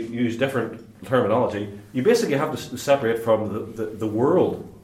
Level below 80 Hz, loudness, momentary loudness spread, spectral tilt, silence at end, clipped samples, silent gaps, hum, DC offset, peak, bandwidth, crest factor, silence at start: -60 dBFS; -23 LUFS; 10 LU; -6 dB/octave; 0.05 s; under 0.1%; none; none; under 0.1%; -6 dBFS; 16 kHz; 18 dB; 0 s